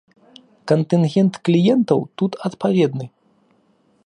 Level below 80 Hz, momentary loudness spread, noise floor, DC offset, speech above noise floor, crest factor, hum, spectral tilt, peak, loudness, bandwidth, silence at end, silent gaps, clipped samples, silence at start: -66 dBFS; 10 LU; -60 dBFS; under 0.1%; 42 dB; 18 dB; none; -8 dB/octave; -2 dBFS; -18 LUFS; 10 kHz; 0.95 s; none; under 0.1%; 0.65 s